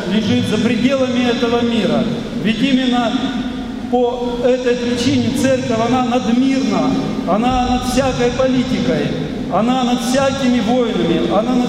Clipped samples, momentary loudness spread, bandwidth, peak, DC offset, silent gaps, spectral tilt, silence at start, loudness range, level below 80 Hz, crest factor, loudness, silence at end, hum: under 0.1%; 4 LU; 14 kHz; -2 dBFS; under 0.1%; none; -5.5 dB/octave; 0 s; 1 LU; -36 dBFS; 14 dB; -16 LUFS; 0 s; none